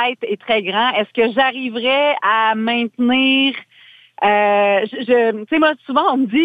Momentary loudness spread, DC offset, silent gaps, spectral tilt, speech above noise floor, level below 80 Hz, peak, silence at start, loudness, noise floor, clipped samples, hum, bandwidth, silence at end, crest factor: 5 LU; under 0.1%; none; -6.5 dB/octave; 31 dB; -62 dBFS; -2 dBFS; 0 s; -16 LUFS; -47 dBFS; under 0.1%; none; 5 kHz; 0 s; 14 dB